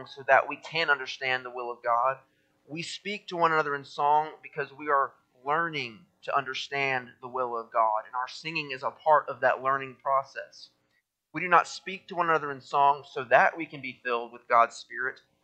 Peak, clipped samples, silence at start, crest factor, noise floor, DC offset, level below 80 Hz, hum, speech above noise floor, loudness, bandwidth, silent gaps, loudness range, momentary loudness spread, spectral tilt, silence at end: -6 dBFS; under 0.1%; 0 s; 24 dB; -75 dBFS; under 0.1%; -80 dBFS; none; 47 dB; -28 LUFS; 9 kHz; none; 4 LU; 13 LU; -4 dB/octave; 0.3 s